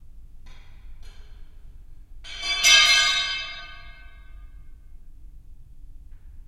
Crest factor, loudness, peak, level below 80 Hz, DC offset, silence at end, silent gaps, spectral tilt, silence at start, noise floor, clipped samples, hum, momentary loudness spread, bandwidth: 24 dB; -17 LUFS; -2 dBFS; -42 dBFS; under 0.1%; 0.1 s; none; 2 dB/octave; 0.15 s; -42 dBFS; under 0.1%; none; 25 LU; 16 kHz